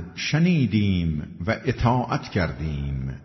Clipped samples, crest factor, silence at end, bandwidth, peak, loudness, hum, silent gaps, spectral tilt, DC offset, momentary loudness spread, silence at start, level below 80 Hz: under 0.1%; 16 dB; 0 s; 6.2 kHz; -8 dBFS; -24 LUFS; none; none; -7 dB/octave; under 0.1%; 9 LU; 0 s; -40 dBFS